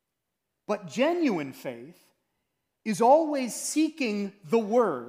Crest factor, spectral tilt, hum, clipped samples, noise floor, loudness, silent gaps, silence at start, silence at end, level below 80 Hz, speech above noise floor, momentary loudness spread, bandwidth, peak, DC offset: 18 dB; -4.5 dB/octave; none; under 0.1%; -83 dBFS; -26 LUFS; none; 0.7 s; 0 s; -84 dBFS; 57 dB; 18 LU; 15.5 kHz; -8 dBFS; under 0.1%